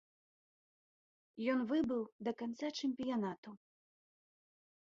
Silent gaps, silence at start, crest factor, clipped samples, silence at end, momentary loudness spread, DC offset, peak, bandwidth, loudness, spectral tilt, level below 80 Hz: 2.12-2.19 s, 3.38-3.43 s; 1.35 s; 18 dB; under 0.1%; 1.3 s; 13 LU; under 0.1%; -24 dBFS; 7.6 kHz; -39 LUFS; -4.5 dB/octave; -80 dBFS